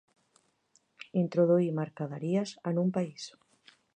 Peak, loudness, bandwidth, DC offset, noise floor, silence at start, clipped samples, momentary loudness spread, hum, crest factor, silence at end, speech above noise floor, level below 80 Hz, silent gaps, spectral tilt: -16 dBFS; -30 LUFS; 9.2 kHz; under 0.1%; -71 dBFS; 1.15 s; under 0.1%; 16 LU; none; 16 dB; 0.65 s; 41 dB; -82 dBFS; none; -7.5 dB/octave